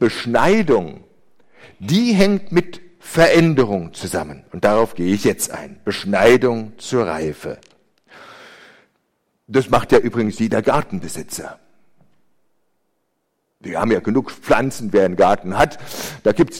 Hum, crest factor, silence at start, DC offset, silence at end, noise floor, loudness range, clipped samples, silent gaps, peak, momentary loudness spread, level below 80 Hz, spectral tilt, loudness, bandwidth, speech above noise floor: none; 18 dB; 0 s; under 0.1%; 0 s; -71 dBFS; 8 LU; under 0.1%; none; 0 dBFS; 15 LU; -44 dBFS; -5.5 dB/octave; -18 LUFS; 16.5 kHz; 54 dB